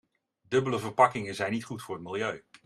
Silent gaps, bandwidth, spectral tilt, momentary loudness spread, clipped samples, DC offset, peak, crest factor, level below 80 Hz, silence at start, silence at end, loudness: none; 13.5 kHz; -5.5 dB/octave; 12 LU; under 0.1%; under 0.1%; -8 dBFS; 22 dB; -70 dBFS; 0.5 s; 0.25 s; -29 LUFS